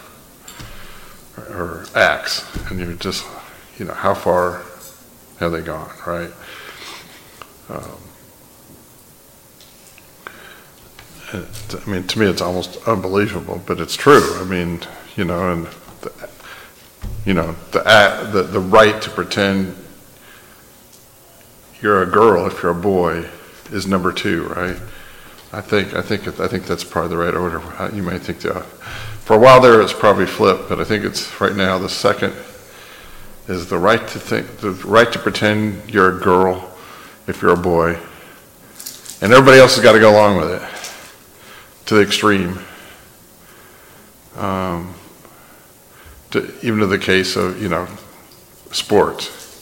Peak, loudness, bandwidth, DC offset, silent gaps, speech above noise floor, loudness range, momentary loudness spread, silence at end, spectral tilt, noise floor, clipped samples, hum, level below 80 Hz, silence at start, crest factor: 0 dBFS; -15 LUFS; 17 kHz; under 0.1%; none; 30 dB; 15 LU; 23 LU; 0.05 s; -5 dB/octave; -46 dBFS; under 0.1%; none; -44 dBFS; 0.5 s; 18 dB